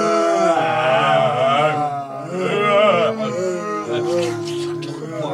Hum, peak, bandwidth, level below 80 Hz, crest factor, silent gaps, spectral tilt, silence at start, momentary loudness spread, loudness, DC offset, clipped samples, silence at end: none; -4 dBFS; 12 kHz; -64 dBFS; 16 dB; none; -5 dB/octave; 0 s; 11 LU; -18 LUFS; under 0.1%; under 0.1%; 0 s